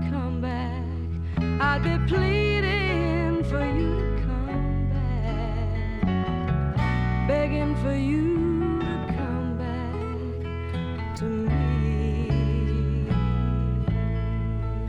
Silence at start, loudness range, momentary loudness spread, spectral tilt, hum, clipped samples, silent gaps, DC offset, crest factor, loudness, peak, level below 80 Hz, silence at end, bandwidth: 0 s; 3 LU; 7 LU; -8.5 dB/octave; none; under 0.1%; none; under 0.1%; 14 dB; -26 LUFS; -10 dBFS; -30 dBFS; 0 s; 8.8 kHz